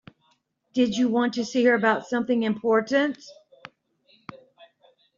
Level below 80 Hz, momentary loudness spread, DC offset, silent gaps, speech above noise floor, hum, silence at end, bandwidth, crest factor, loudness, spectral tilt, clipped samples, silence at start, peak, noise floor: -70 dBFS; 24 LU; under 0.1%; none; 45 dB; none; 0.8 s; 7.6 kHz; 20 dB; -23 LUFS; -3.5 dB/octave; under 0.1%; 0.75 s; -6 dBFS; -68 dBFS